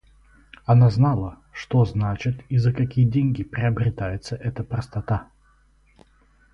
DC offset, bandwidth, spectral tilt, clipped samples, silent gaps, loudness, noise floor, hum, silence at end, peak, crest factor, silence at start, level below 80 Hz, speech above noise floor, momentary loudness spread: under 0.1%; 6.8 kHz; -8.5 dB/octave; under 0.1%; none; -22 LUFS; -58 dBFS; none; 1.3 s; -6 dBFS; 16 dB; 0.7 s; -44 dBFS; 37 dB; 12 LU